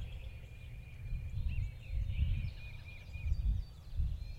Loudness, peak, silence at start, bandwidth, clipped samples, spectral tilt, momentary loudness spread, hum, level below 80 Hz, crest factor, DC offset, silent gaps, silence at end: -42 LUFS; -22 dBFS; 0 s; 7.8 kHz; under 0.1%; -7 dB/octave; 13 LU; none; -40 dBFS; 16 dB; under 0.1%; none; 0 s